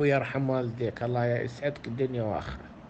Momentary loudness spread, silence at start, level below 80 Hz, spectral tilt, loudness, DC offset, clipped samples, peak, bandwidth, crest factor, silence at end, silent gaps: 6 LU; 0 s; -54 dBFS; -8 dB/octave; -30 LUFS; under 0.1%; under 0.1%; -12 dBFS; 8.2 kHz; 18 dB; 0 s; none